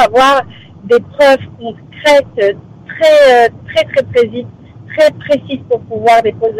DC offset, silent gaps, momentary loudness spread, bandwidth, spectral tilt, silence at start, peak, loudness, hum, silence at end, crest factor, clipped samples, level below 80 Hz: under 0.1%; none; 19 LU; 15.5 kHz; -4.5 dB/octave; 0 s; -2 dBFS; -11 LUFS; none; 0 s; 10 dB; under 0.1%; -46 dBFS